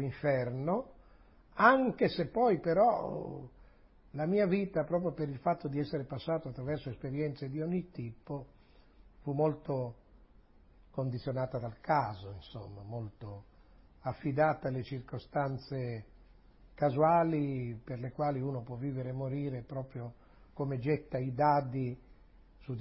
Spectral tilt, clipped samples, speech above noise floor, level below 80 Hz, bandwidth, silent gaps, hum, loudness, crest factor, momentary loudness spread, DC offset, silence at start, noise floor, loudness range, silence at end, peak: -6.5 dB/octave; under 0.1%; 28 dB; -60 dBFS; 5.6 kHz; none; none; -34 LUFS; 24 dB; 17 LU; under 0.1%; 0 s; -61 dBFS; 8 LU; 0 s; -10 dBFS